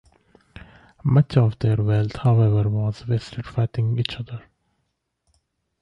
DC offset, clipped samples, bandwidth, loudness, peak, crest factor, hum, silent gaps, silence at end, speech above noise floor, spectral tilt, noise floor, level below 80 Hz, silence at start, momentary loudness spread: under 0.1%; under 0.1%; 7.4 kHz; -22 LUFS; -4 dBFS; 18 dB; none; none; 1.45 s; 54 dB; -8.5 dB/octave; -74 dBFS; -46 dBFS; 1.05 s; 11 LU